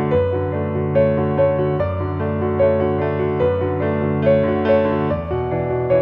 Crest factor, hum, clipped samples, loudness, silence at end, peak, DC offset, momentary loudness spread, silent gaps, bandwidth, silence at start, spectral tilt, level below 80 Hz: 14 dB; none; under 0.1%; -19 LUFS; 0 s; -4 dBFS; under 0.1%; 5 LU; none; 5.4 kHz; 0 s; -11 dB/octave; -42 dBFS